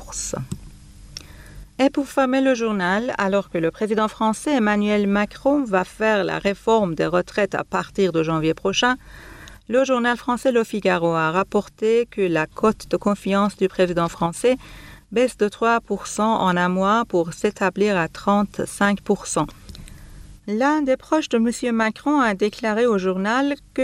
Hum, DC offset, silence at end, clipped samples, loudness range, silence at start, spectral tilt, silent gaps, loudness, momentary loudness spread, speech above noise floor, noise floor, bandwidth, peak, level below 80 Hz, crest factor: none; under 0.1%; 0 s; under 0.1%; 2 LU; 0 s; -5 dB/octave; none; -21 LUFS; 8 LU; 22 dB; -42 dBFS; 14 kHz; -6 dBFS; -48 dBFS; 14 dB